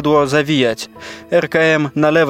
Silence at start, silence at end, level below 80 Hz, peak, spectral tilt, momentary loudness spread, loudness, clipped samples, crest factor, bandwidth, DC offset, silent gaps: 0 s; 0 s; -50 dBFS; -2 dBFS; -5.5 dB/octave; 13 LU; -15 LUFS; under 0.1%; 14 dB; 15.5 kHz; under 0.1%; none